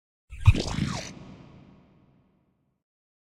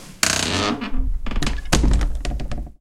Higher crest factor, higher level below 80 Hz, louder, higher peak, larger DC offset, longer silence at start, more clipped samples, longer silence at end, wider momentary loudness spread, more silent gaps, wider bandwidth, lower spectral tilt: about the same, 24 dB vs 20 dB; second, -38 dBFS vs -24 dBFS; second, -26 LUFS vs -22 LUFS; second, -4 dBFS vs 0 dBFS; neither; first, 0.3 s vs 0 s; neither; first, 1.95 s vs 0.1 s; first, 24 LU vs 10 LU; neither; second, 11.5 kHz vs 17 kHz; first, -6 dB/octave vs -3.5 dB/octave